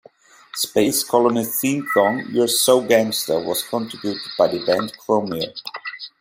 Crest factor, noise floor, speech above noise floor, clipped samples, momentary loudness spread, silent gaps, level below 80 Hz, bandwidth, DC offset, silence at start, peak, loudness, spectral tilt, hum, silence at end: 18 dB; -49 dBFS; 30 dB; under 0.1%; 11 LU; none; -64 dBFS; 16 kHz; under 0.1%; 0.55 s; -2 dBFS; -19 LUFS; -3 dB/octave; none; 0.1 s